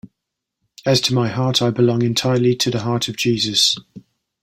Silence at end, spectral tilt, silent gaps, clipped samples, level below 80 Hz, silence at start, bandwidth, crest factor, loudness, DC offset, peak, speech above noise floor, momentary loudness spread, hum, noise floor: 0.4 s; -4.5 dB/octave; none; under 0.1%; -54 dBFS; 0.05 s; 16.5 kHz; 18 dB; -17 LUFS; under 0.1%; -2 dBFS; 63 dB; 5 LU; none; -80 dBFS